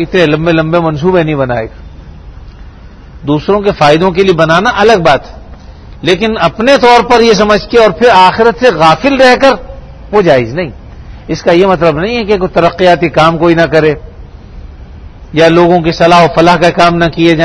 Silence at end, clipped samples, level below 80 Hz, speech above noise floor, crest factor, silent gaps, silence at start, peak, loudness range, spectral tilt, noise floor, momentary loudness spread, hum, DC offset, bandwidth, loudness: 0 s; 3%; -30 dBFS; 24 dB; 8 dB; none; 0 s; 0 dBFS; 6 LU; -6 dB/octave; -31 dBFS; 9 LU; none; under 0.1%; 11 kHz; -7 LUFS